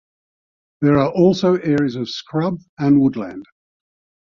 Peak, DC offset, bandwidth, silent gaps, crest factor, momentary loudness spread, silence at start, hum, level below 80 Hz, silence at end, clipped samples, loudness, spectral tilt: -2 dBFS; under 0.1%; 7.2 kHz; 2.69-2.77 s; 16 dB; 12 LU; 0.8 s; none; -52 dBFS; 0.9 s; under 0.1%; -18 LUFS; -7.5 dB/octave